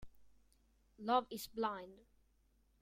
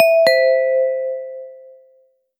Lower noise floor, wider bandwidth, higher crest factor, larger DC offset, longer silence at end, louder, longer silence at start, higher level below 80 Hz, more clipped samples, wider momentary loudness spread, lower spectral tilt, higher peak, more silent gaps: first, -74 dBFS vs -57 dBFS; about the same, 16 kHz vs 17 kHz; first, 22 dB vs 16 dB; neither; about the same, 0.85 s vs 0.85 s; second, -40 LUFS vs -16 LUFS; about the same, 0 s vs 0 s; first, -70 dBFS vs -76 dBFS; neither; second, 13 LU vs 21 LU; first, -4 dB/octave vs -1.5 dB/octave; second, -22 dBFS vs 0 dBFS; neither